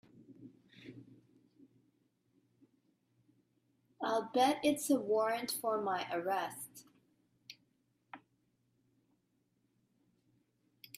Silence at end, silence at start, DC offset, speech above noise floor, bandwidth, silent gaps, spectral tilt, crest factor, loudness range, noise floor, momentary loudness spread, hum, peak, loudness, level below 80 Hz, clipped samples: 2.8 s; 0.3 s; under 0.1%; 45 dB; 15.5 kHz; none; -3.5 dB/octave; 22 dB; 11 LU; -79 dBFS; 25 LU; none; -18 dBFS; -35 LUFS; -84 dBFS; under 0.1%